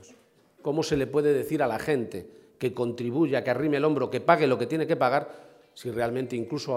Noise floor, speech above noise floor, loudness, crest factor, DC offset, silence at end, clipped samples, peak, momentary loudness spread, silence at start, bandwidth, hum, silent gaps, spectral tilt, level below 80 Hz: -59 dBFS; 33 dB; -26 LUFS; 22 dB; under 0.1%; 0 s; under 0.1%; -4 dBFS; 11 LU; 0.65 s; 16 kHz; none; none; -6.5 dB/octave; -60 dBFS